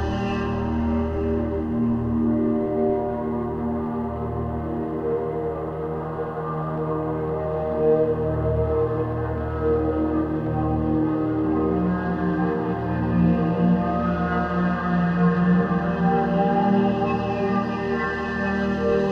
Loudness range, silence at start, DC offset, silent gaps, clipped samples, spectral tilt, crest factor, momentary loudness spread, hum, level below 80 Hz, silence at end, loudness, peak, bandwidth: 6 LU; 0 s; under 0.1%; none; under 0.1%; -9.5 dB/octave; 14 dB; 7 LU; none; -38 dBFS; 0 s; -23 LUFS; -8 dBFS; 6.4 kHz